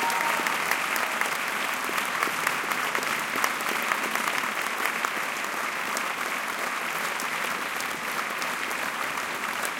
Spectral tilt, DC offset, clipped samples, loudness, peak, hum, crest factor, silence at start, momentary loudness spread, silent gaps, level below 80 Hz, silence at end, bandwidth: -1 dB/octave; under 0.1%; under 0.1%; -27 LUFS; -4 dBFS; none; 24 dB; 0 s; 4 LU; none; -70 dBFS; 0 s; 17 kHz